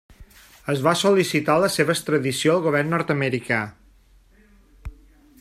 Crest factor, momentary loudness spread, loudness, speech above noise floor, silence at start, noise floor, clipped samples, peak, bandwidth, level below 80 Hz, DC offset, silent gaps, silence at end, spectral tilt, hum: 18 dB; 19 LU; -21 LUFS; 34 dB; 0.2 s; -54 dBFS; under 0.1%; -4 dBFS; 15.5 kHz; -50 dBFS; under 0.1%; none; 0.5 s; -5 dB/octave; none